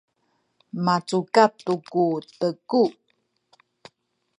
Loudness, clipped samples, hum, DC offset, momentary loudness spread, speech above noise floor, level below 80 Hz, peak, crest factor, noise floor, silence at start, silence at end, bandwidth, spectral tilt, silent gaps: -23 LUFS; under 0.1%; none; under 0.1%; 9 LU; 49 dB; -76 dBFS; -2 dBFS; 22 dB; -71 dBFS; 0.75 s; 1.5 s; 11 kHz; -6 dB/octave; none